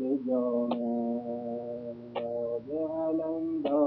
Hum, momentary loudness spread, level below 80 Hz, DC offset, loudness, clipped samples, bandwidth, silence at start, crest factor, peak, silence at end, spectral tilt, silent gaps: none; 8 LU; -72 dBFS; under 0.1%; -32 LUFS; under 0.1%; 4.8 kHz; 0 s; 16 dB; -14 dBFS; 0 s; -10 dB/octave; none